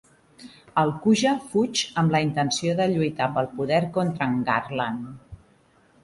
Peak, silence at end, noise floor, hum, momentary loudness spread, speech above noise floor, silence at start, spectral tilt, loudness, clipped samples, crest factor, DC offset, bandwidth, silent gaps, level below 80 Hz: -6 dBFS; 0.65 s; -59 dBFS; none; 7 LU; 36 dB; 0.4 s; -5 dB/octave; -24 LUFS; under 0.1%; 18 dB; under 0.1%; 11.5 kHz; none; -58 dBFS